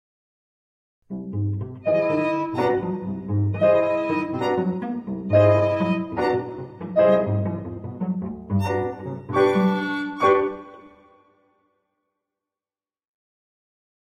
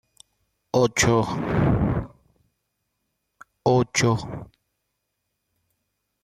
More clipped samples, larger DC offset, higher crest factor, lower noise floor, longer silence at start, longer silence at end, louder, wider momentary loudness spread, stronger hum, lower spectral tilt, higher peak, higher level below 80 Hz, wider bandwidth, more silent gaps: neither; neither; about the same, 18 dB vs 18 dB; first, under -90 dBFS vs -78 dBFS; first, 1.1 s vs 0.75 s; first, 3.2 s vs 1.8 s; about the same, -22 LUFS vs -22 LUFS; about the same, 12 LU vs 12 LU; neither; first, -8.5 dB/octave vs -5 dB/octave; about the same, -4 dBFS vs -6 dBFS; second, -58 dBFS vs -42 dBFS; second, 10.5 kHz vs 14 kHz; neither